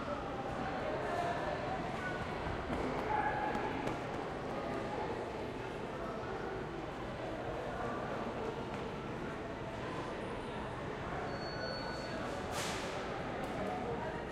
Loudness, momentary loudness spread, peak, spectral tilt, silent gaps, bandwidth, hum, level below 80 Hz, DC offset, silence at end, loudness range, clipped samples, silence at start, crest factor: -40 LUFS; 5 LU; -22 dBFS; -5.5 dB/octave; none; 16 kHz; none; -54 dBFS; under 0.1%; 0 s; 4 LU; under 0.1%; 0 s; 16 dB